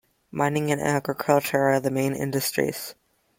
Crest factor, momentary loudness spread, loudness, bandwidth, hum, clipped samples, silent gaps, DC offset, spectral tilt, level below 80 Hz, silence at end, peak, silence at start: 20 dB; 8 LU; -24 LUFS; 17 kHz; none; under 0.1%; none; under 0.1%; -5 dB/octave; -62 dBFS; 0.45 s; -6 dBFS; 0.35 s